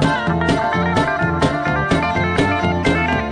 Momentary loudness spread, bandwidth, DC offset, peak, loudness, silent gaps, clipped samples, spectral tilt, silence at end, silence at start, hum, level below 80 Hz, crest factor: 1 LU; 10.5 kHz; under 0.1%; -2 dBFS; -17 LUFS; none; under 0.1%; -6 dB/octave; 0 s; 0 s; none; -34 dBFS; 14 dB